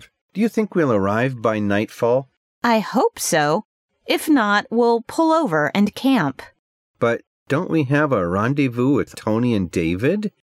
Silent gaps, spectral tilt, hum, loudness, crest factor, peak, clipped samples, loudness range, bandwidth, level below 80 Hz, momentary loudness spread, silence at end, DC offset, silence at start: 2.37-2.62 s, 3.65-3.88 s, 6.59-6.94 s, 7.27-7.46 s; -5.5 dB/octave; none; -20 LUFS; 14 dB; -6 dBFS; under 0.1%; 2 LU; 16 kHz; -56 dBFS; 6 LU; 0.25 s; under 0.1%; 0.35 s